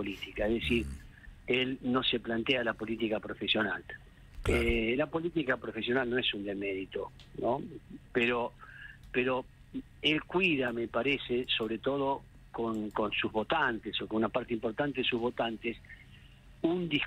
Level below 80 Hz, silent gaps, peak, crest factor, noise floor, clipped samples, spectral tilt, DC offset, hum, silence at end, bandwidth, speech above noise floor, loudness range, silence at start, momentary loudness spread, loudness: -50 dBFS; none; -14 dBFS; 20 dB; -55 dBFS; under 0.1%; -6 dB/octave; under 0.1%; none; 0 s; 14.5 kHz; 22 dB; 3 LU; 0 s; 14 LU; -32 LUFS